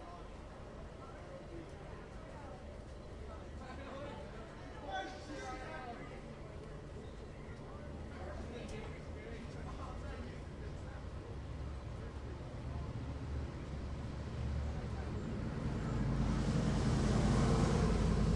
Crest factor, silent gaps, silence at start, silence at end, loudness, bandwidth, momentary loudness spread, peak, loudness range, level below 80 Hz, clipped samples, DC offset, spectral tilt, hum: 20 dB; none; 0 s; 0 s; -42 LUFS; 11.5 kHz; 17 LU; -20 dBFS; 13 LU; -46 dBFS; under 0.1%; under 0.1%; -6.5 dB/octave; none